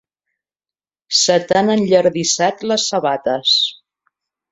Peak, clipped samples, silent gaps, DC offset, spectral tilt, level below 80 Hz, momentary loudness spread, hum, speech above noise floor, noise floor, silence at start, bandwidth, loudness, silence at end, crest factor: 0 dBFS; under 0.1%; none; under 0.1%; -2.5 dB/octave; -60 dBFS; 5 LU; 50 Hz at -60 dBFS; over 74 dB; under -90 dBFS; 1.1 s; 8.2 kHz; -15 LUFS; 0.8 s; 18 dB